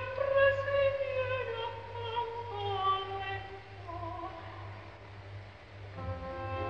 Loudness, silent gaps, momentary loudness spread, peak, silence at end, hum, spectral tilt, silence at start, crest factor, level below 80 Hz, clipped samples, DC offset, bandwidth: -34 LUFS; none; 20 LU; -16 dBFS; 0 s; 50 Hz at -50 dBFS; -6.5 dB/octave; 0 s; 20 dB; -56 dBFS; under 0.1%; 0.1%; 6.8 kHz